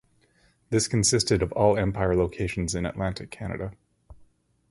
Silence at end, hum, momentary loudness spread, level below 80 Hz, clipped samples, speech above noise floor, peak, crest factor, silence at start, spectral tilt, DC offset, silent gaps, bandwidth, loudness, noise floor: 0.6 s; none; 13 LU; -42 dBFS; under 0.1%; 39 dB; -6 dBFS; 20 dB; 0.7 s; -4.5 dB/octave; under 0.1%; none; 11.5 kHz; -25 LUFS; -64 dBFS